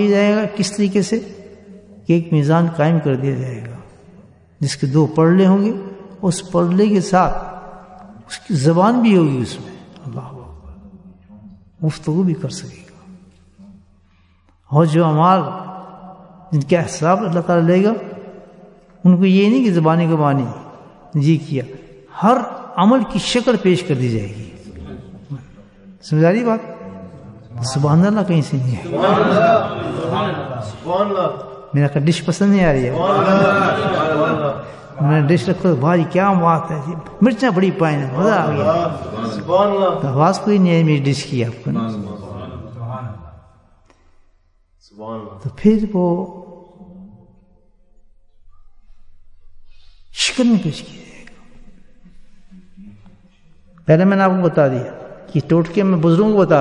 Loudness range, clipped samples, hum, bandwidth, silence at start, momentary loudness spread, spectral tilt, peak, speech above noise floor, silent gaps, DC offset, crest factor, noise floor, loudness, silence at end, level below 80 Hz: 9 LU; under 0.1%; none; 11 kHz; 0 s; 20 LU; -7 dB/octave; 0 dBFS; 40 dB; none; under 0.1%; 16 dB; -56 dBFS; -16 LUFS; 0 s; -46 dBFS